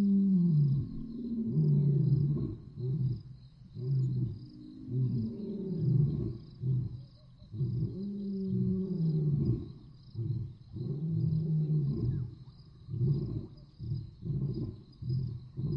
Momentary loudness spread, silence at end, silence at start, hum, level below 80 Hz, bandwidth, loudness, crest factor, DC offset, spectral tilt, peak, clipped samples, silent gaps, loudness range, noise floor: 18 LU; 0 s; 0 s; none; -52 dBFS; 5.4 kHz; -33 LUFS; 14 dB; under 0.1%; -12.5 dB/octave; -18 dBFS; under 0.1%; none; 4 LU; -54 dBFS